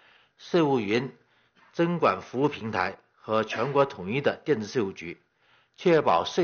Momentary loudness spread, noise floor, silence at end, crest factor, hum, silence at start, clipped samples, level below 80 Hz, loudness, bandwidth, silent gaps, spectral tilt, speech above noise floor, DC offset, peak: 15 LU; -65 dBFS; 0 s; 18 dB; none; 0.4 s; under 0.1%; -68 dBFS; -26 LUFS; 7 kHz; none; -4.5 dB/octave; 39 dB; under 0.1%; -10 dBFS